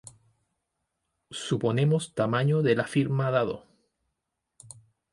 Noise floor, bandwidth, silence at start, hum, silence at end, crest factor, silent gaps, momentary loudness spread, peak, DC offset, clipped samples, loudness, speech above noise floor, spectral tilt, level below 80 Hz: -83 dBFS; 11.5 kHz; 1.3 s; none; 0.45 s; 18 dB; none; 11 LU; -10 dBFS; under 0.1%; under 0.1%; -26 LUFS; 57 dB; -6.5 dB/octave; -66 dBFS